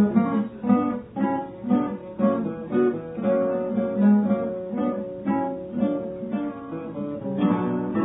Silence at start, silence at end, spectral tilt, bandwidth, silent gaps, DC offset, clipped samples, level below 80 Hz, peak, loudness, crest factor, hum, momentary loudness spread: 0 s; 0 s; -12.5 dB/octave; 3.9 kHz; none; under 0.1%; under 0.1%; -58 dBFS; -8 dBFS; -25 LUFS; 16 dB; none; 9 LU